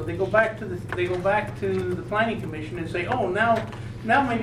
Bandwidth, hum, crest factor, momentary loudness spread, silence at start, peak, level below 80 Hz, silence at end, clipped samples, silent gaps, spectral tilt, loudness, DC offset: 14 kHz; none; 20 dB; 10 LU; 0 s; -4 dBFS; -48 dBFS; 0 s; under 0.1%; none; -6.5 dB/octave; -25 LUFS; under 0.1%